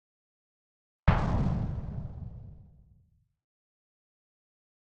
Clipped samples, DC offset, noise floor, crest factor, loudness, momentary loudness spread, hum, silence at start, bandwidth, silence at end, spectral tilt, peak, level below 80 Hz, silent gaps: under 0.1%; under 0.1%; -67 dBFS; 28 dB; -31 LUFS; 19 LU; none; 1.05 s; 7.8 kHz; 2.35 s; -8.5 dB/octave; -6 dBFS; -40 dBFS; none